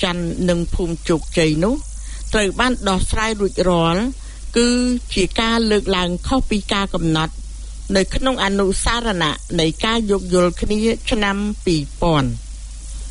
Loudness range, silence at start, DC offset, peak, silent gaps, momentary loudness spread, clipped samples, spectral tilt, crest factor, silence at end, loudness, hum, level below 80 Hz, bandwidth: 1 LU; 0 s; under 0.1%; -2 dBFS; none; 9 LU; under 0.1%; -4.5 dB/octave; 16 dB; 0 s; -19 LUFS; none; -28 dBFS; 11 kHz